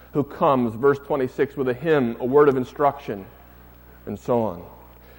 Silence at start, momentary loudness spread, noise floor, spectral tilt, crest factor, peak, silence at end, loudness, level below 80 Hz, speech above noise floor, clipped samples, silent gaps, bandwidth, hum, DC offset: 0.15 s; 16 LU; -47 dBFS; -8 dB/octave; 18 dB; -4 dBFS; 0.45 s; -22 LUFS; -52 dBFS; 26 dB; under 0.1%; none; 16.5 kHz; none; under 0.1%